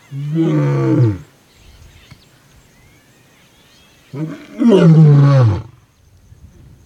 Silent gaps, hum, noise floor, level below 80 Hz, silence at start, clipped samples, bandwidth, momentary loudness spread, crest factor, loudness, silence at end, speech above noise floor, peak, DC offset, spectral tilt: none; none; -49 dBFS; -48 dBFS; 0.1 s; under 0.1%; 7.6 kHz; 19 LU; 16 dB; -12 LUFS; 1.2 s; 38 dB; 0 dBFS; under 0.1%; -9 dB/octave